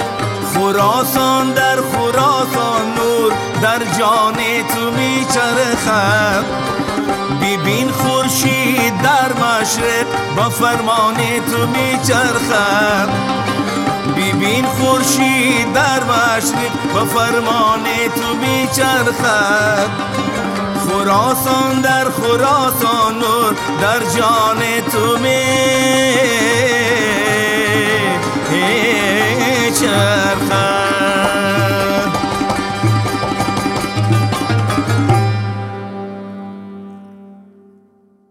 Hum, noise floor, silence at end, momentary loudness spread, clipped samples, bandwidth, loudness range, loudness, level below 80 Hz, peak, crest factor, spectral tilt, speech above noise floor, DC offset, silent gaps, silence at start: none; -51 dBFS; 0.95 s; 5 LU; under 0.1%; 17.5 kHz; 3 LU; -14 LUFS; -46 dBFS; 0 dBFS; 14 dB; -4 dB/octave; 38 dB; under 0.1%; none; 0 s